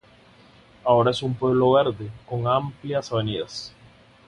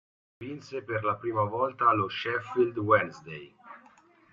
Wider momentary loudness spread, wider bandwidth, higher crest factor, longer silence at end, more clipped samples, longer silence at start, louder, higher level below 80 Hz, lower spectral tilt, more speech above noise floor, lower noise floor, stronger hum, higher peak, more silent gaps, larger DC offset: second, 14 LU vs 19 LU; first, 11 kHz vs 7.2 kHz; about the same, 20 dB vs 20 dB; about the same, 0.6 s vs 0.55 s; neither; first, 0.85 s vs 0.4 s; first, -23 LUFS vs -28 LUFS; first, -54 dBFS vs -70 dBFS; about the same, -6.5 dB/octave vs -7 dB/octave; about the same, 30 dB vs 30 dB; second, -53 dBFS vs -59 dBFS; neither; first, -4 dBFS vs -10 dBFS; neither; neither